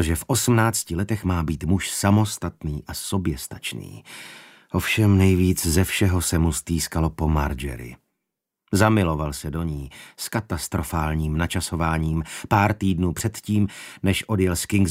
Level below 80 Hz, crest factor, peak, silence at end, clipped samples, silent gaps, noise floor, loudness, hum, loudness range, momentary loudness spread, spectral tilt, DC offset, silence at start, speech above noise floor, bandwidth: -36 dBFS; 20 dB; -4 dBFS; 0 s; under 0.1%; none; -83 dBFS; -23 LUFS; none; 4 LU; 13 LU; -5 dB/octave; under 0.1%; 0 s; 60 dB; 16 kHz